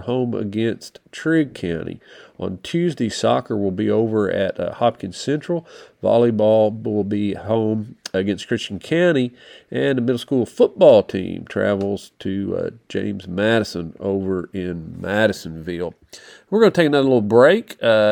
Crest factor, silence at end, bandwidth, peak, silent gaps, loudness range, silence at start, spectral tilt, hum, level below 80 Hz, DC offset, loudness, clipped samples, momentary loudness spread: 20 dB; 0 s; 18.5 kHz; 0 dBFS; none; 5 LU; 0 s; -6.5 dB/octave; none; -56 dBFS; under 0.1%; -20 LUFS; under 0.1%; 13 LU